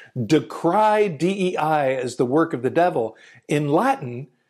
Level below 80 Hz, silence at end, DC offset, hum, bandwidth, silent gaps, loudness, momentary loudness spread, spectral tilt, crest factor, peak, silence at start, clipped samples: -68 dBFS; 0.25 s; under 0.1%; none; 14 kHz; none; -21 LUFS; 7 LU; -6.5 dB/octave; 14 dB; -6 dBFS; 0 s; under 0.1%